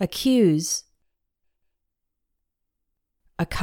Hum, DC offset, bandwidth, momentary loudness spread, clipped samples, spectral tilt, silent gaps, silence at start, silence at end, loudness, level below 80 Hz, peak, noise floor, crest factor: none; under 0.1%; 18.5 kHz; 12 LU; under 0.1%; -4.5 dB/octave; none; 0 s; 0 s; -22 LUFS; -48 dBFS; -8 dBFS; -79 dBFS; 18 dB